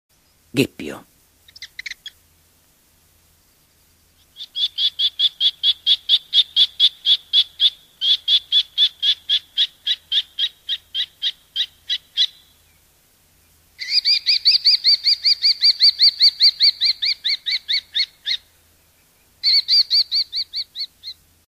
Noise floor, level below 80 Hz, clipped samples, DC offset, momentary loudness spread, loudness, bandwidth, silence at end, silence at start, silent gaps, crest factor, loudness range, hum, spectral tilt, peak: -57 dBFS; -64 dBFS; under 0.1%; under 0.1%; 14 LU; -16 LUFS; 15.5 kHz; 0.4 s; 0.55 s; none; 18 dB; 11 LU; none; -1.5 dB/octave; -2 dBFS